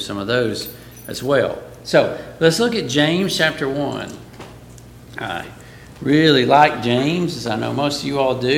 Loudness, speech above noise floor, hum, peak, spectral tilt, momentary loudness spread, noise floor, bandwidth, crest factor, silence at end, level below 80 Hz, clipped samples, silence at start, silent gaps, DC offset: -18 LUFS; 22 dB; 60 Hz at -45 dBFS; 0 dBFS; -5 dB/octave; 19 LU; -40 dBFS; 17 kHz; 18 dB; 0 s; -50 dBFS; under 0.1%; 0 s; none; under 0.1%